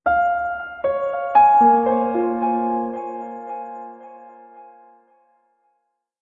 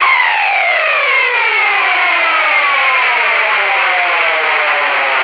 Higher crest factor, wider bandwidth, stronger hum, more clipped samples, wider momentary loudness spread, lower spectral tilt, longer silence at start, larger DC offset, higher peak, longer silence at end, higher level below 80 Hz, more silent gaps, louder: first, 16 dB vs 10 dB; second, 4.2 kHz vs 6.2 kHz; neither; neither; first, 19 LU vs 1 LU; first, -8 dB/octave vs -1 dB/octave; about the same, 0.05 s vs 0 s; neither; about the same, -4 dBFS vs -2 dBFS; first, 1.55 s vs 0 s; first, -56 dBFS vs under -90 dBFS; neither; second, -19 LUFS vs -10 LUFS